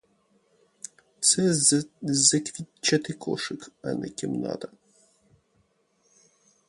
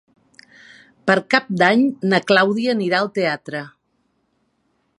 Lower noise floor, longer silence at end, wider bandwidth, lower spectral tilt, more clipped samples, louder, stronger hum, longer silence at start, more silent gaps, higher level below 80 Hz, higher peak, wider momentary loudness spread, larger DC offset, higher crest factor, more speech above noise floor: about the same, -69 dBFS vs -67 dBFS; first, 2 s vs 1.3 s; about the same, 11.5 kHz vs 11.5 kHz; second, -3 dB/octave vs -5.5 dB/octave; neither; second, -24 LUFS vs -18 LUFS; neither; first, 1.2 s vs 1.05 s; neither; about the same, -68 dBFS vs -66 dBFS; second, -6 dBFS vs 0 dBFS; first, 22 LU vs 12 LU; neither; about the same, 24 dB vs 20 dB; second, 42 dB vs 50 dB